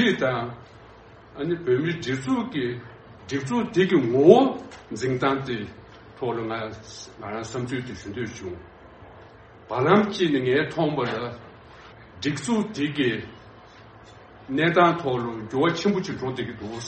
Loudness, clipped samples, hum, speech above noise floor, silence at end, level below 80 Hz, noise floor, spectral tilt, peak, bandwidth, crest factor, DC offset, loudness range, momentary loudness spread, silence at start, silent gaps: -24 LUFS; under 0.1%; none; 24 dB; 0 s; -58 dBFS; -48 dBFS; -6 dB/octave; 0 dBFS; 8.4 kHz; 24 dB; under 0.1%; 10 LU; 18 LU; 0 s; none